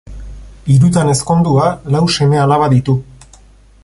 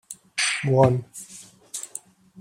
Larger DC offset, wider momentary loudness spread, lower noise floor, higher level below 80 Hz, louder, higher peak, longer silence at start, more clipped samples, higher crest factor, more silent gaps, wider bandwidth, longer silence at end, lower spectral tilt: neither; second, 10 LU vs 20 LU; about the same, -43 dBFS vs -43 dBFS; first, -36 dBFS vs -58 dBFS; first, -12 LUFS vs -23 LUFS; first, 0 dBFS vs -4 dBFS; about the same, 0.1 s vs 0.1 s; neither; second, 12 dB vs 22 dB; neither; second, 11.5 kHz vs 16 kHz; first, 0.8 s vs 0 s; first, -6.5 dB/octave vs -4.5 dB/octave